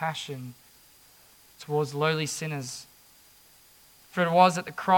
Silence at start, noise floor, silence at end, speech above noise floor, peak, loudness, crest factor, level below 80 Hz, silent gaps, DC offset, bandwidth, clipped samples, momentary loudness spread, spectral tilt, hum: 0 s; -57 dBFS; 0 s; 31 dB; -4 dBFS; -27 LUFS; 24 dB; -72 dBFS; none; under 0.1%; 18 kHz; under 0.1%; 20 LU; -4.5 dB/octave; none